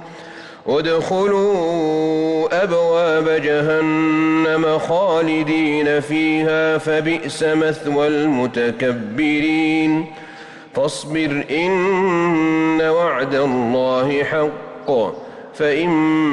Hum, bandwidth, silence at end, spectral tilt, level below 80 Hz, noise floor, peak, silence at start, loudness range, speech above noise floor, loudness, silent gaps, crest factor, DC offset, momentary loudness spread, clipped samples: none; 11 kHz; 0 s; -6 dB/octave; -56 dBFS; -37 dBFS; -8 dBFS; 0 s; 2 LU; 20 dB; -17 LUFS; none; 8 dB; under 0.1%; 6 LU; under 0.1%